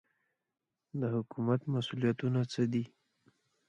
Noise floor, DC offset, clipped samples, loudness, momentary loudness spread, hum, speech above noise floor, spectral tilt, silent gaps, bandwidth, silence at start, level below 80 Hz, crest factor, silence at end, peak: -81 dBFS; under 0.1%; under 0.1%; -34 LUFS; 6 LU; none; 48 dB; -7.5 dB/octave; none; 8.6 kHz; 0.95 s; -74 dBFS; 18 dB; 0.85 s; -18 dBFS